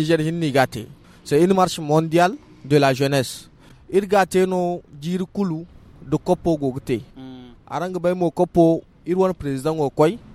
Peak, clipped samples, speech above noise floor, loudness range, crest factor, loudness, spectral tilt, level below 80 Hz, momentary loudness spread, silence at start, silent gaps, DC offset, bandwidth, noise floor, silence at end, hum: -2 dBFS; under 0.1%; 20 dB; 5 LU; 18 dB; -21 LUFS; -6.5 dB/octave; -50 dBFS; 13 LU; 0 s; none; under 0.1%; 15.5 kHz; -39 dBFS; 0 s; none